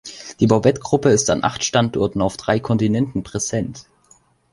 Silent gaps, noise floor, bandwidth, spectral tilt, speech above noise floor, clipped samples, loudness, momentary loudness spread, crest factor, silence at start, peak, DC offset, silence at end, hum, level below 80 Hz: none; -55 dBFS; 11.5 kHz; -5 dB/octave; 37 dB; under 0.1%; -19 LUFS; 8 LU; 18 dB; 0.05 s; -2 dBFS; under 0.1%; 0.7 s; none; -46 dBFS